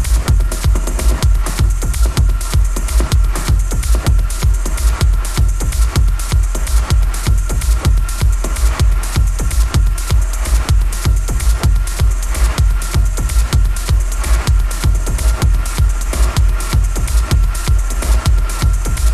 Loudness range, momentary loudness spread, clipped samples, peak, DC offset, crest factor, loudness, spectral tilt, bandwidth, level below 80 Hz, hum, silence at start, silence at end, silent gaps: 0 LU; 2 LU; under 0.1%; 0 dBFS; under 0.1%; 12 dB; -16 LUFS; -4.5 dB/octave; 14 kHz; -14 dBFS; none; 0 s; 0 s; none